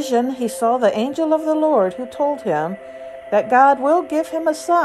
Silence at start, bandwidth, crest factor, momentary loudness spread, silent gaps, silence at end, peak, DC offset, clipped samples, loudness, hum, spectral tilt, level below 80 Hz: 0 s; 13 kHz; 16 dB; 9 LU; none; 0 s; -2 dBFS; under 0.1%; under 0.1%; -18 LUFS; none; -5 dB/octave; -62 dBFS